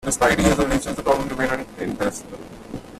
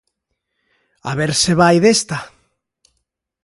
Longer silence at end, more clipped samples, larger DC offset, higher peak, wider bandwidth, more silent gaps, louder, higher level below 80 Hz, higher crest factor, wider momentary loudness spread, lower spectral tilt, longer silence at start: second, 0 s vs 1.2 s; neither; neither; second, -4 dBFS vs 0 dBFS; first, 15 kHz vs 11.5 kHz; neither; second, -21 LUFS vs -15 LUFS; first, -36 dBFS vs -50 dBFS; about the same, 18 dB vs 18 dB; first, 19 LU vs 15 LU; about the same, -4.5 dB/octave vs -4 dB/octave; second, 0 s vs 1.05 s